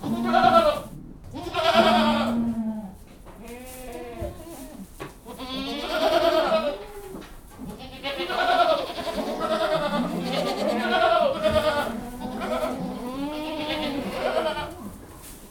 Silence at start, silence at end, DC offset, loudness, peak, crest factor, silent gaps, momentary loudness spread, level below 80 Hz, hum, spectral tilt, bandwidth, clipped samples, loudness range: 0 s; 0 s; under 0.1%; -24 LUFS; -4 dBFS; 22 dB; none; 20 LU; -46 dBFS; none; -4.5 dB/octave; 19 kHz; under 0.1%; 6 LU